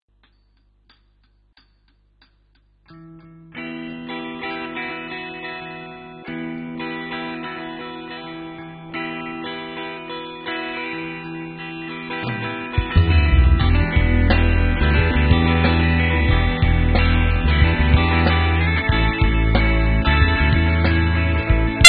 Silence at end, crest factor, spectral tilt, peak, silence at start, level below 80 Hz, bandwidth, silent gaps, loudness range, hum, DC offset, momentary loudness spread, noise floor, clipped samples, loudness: 0 s; 18 dB; -5 dB/octave; 0 dBFS; 2.9 s; -22 dBFS; 11 kHz; none; 13 LU; 50 Hz at -50 dBFS; under 0.1%; 15 LU; -59 dBFS; 0.1%; -20 LUFS